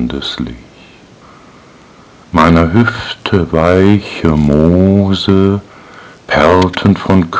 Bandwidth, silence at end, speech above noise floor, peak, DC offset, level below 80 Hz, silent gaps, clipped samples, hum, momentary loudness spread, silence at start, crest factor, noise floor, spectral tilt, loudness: 8 kHz; 0 s; 30 dB; 0 dBFS; under 0.1%; -28 dBFS; none; 2%; none; 10 LU; 0 s; 12 dB; -40 dBFS; -7.5 dB/octave; -11 LUFS